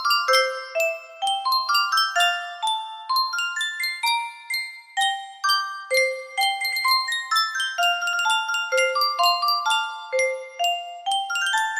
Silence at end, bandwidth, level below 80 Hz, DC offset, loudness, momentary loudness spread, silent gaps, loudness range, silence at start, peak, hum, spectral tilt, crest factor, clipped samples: 0 s; 15.5 kHz; -78 dBFS; under 0.1%; -22 LUFS; 7 LU; none; 3 LU; 0 s; -6 dBFS; none; 3.5 dB/octave; 18 dB; under 0.1%